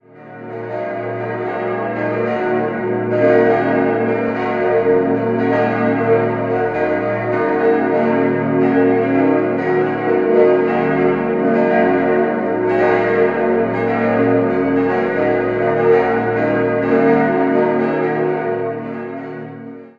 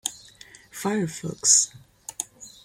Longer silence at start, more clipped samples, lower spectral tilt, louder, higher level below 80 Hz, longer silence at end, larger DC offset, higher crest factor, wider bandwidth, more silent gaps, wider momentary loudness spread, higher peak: about the same, 0.15 s vs 0.05 s; neither; first, -9 dB/octave vs -2 dB/octave; first, -16 LUFS vs -22 LUFS; first, -50 dBFS vs -66 dBFS; about the same, 0.1 s vs 0.15 s; neither; second, 16 dB vs 22 dB; second, 5.4 kHz vs 16.5 kHz; neither; second, 9 LU vs 23 LU; first, 0 dBFS vs -4 dBFS